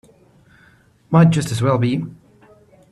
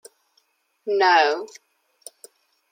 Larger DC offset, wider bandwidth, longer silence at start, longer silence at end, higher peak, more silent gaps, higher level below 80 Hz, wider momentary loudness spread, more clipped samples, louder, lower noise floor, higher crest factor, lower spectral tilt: neither; second, 12 kHz vs 16.5 kHz; first, 1.1 s vs 0.85 s; second, 0.75 s vs 1.25 s; about the same, -2 dBFS vs -4 dBFS; neither; first, -54 dBFS vs under -90 dBFS; second, 11 LU vs 26 LU; neither; about the same, -17 LUFS vs -19 LUFS; second, -53 dBFS vs -67 dBFS; about the same, 18 dB vs 20 dB; first, -7 dB/octave vs -1 dB/octave